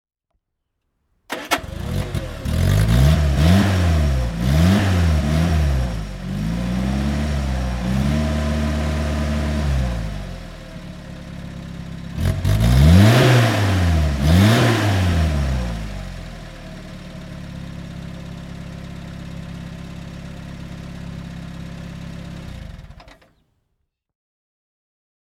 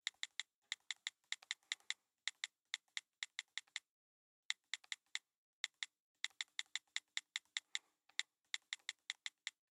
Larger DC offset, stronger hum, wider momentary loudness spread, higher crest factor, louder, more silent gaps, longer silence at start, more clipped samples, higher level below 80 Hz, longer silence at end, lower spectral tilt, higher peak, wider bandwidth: neither; neither; first, 20 LU vs 5 LU; second, 18 dB vs 30 dB; first, -18 LUFS vs -47 LUFS; second, none vs 0.56-0.62 s, 3.90-4.50 s, 5.35-5.64 s, 6.00-6.15 s; first, 1.3 s vs 0.05 s; neither; first, -26 dBFS vs under -90 dBFS; first, 2.2 s vs 0.2 s; first, -6.5 dB/octave vs 6.5 dB/octave; first, -2 dBFS vs -20 dBFS; first, 16.5 kHz vs 14 kHz